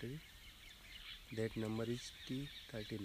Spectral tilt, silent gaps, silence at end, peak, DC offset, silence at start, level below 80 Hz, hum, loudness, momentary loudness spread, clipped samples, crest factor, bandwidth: -5.5 dB/octave; none; 0 s; -28 dBFS; under 0.1%; 0 s; -64 dBFS; none; -46 LUFS; 15 LU; under 0.1%; 18 dB; 15.5 kHz